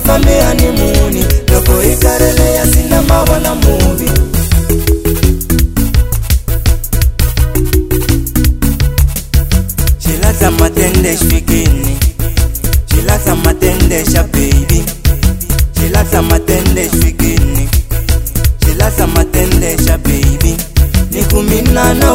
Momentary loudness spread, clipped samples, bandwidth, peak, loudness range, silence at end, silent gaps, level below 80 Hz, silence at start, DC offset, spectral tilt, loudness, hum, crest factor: 4 LU; 0.6%; 16.5 kHz; 0 dBFS; 3 LU; 0 s; none; -12 dBFS; 0 s; under 0.1%; -5 dB/octave; -11 LUFS; none; 10 dB